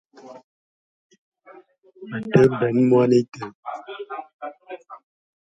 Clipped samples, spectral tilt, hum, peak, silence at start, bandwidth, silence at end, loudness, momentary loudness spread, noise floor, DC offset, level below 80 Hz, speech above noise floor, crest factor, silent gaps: under 0.1%; -8 dB/octave; none; -2 dBFS; 0.25 s; 7.8 kHz; 0.45 s; -19 LUFS; 21 LU; -51 dBFS; under 0.1%; -62 dBFS; 32 dB; 22 dB; 0.44-1.10 s, 1.18-1.32 s, 3.55-3.63 s, 4.34-4.39 s